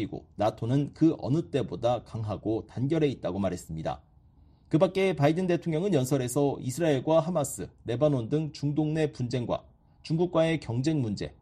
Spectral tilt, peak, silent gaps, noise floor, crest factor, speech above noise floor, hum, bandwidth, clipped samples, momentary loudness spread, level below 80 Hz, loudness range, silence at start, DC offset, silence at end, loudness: -6.5 dB/octave; -10 dBFS; none; -58 dBFS; 18 dB; 30 dB; none; 13 kHz; under 0.1%; 9 LU; -56 dBFS; 4 LU; 0 s; under 0.1%; 0.1 s; -28 LUFS